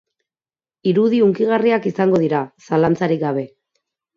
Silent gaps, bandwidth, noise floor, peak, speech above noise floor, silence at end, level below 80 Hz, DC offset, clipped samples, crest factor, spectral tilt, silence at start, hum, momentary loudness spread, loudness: none; 7.2 kHz; under -90 dBFS; -4 dBFS; over 73 dB; 0.7 s; -60 dBFS; under 0.1%; under 0.1%; 14 dB; -8 dB/octave; 0.85 s; none; 8 LU; -18 LUFS